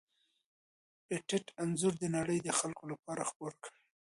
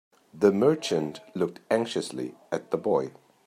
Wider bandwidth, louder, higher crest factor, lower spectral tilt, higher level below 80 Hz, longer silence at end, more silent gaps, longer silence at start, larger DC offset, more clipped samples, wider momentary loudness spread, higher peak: second, 11.5 kHz vs 14.5 kHz; second, -37 LUFS vs -27 LUFS; about the same, 20 dB vs 20 dB; about the same, -4.5 dB/octave vs -5.5 dB/octave; about the same, -74 dBFS vs -72 dBFS; about the same, 0.35 s vs 0.35 s; first, 2.99-3.03 s, 3.36-3.40 s vs none; first, 1.1 s vs 0.35 s; neither; neither; about the same, 13 LU vs 12 LU; second, -18 dBFS vs -8 dBFS